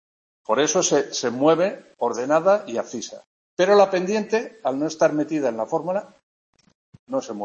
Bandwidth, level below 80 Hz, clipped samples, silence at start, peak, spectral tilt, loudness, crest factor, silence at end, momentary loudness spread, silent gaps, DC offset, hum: 8.2 kHz; -72 dBFS; under 0.1%; 0.5 s; -4 dBFS; -4 dB/octave; -22 LUFS; 20 dB; 0 s; 11 LU; 3.27-3.57 s, 6.23-6.53 s, 6.75-6.93 s, 6.99-7.07 s; under 0.1%; none